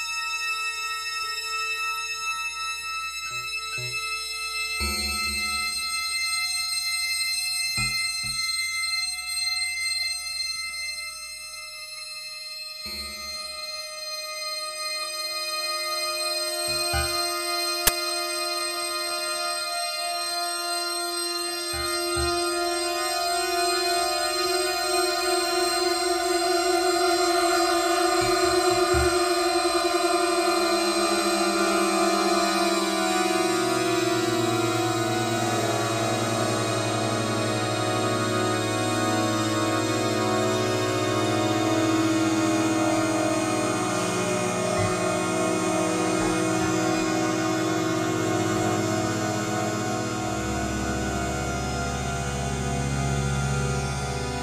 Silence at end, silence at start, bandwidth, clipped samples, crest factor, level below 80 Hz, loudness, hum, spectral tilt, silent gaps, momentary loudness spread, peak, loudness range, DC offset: 0 s; 0 s; 15.5 kHz; under 0.1%; 22 dB; -44 dBFS; -25 LUFS; none; -3.5 dB/octave; none; 6 LU; -2 dBFS; 6 LU; under 0.1%